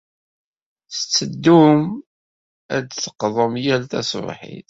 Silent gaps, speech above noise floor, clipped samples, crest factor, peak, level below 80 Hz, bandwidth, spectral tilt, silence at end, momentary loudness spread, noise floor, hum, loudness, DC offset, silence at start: 2.06-2.69 s; over 72 dB; under 0.1%; 18 dB; -2 dBFS; -60 dBFS; 7.8 kHz; -5 dB/octave; 0.1 s; 15 LU; under -90 dBFS; none; -18 LUFS; under 0.1%; 0.9 s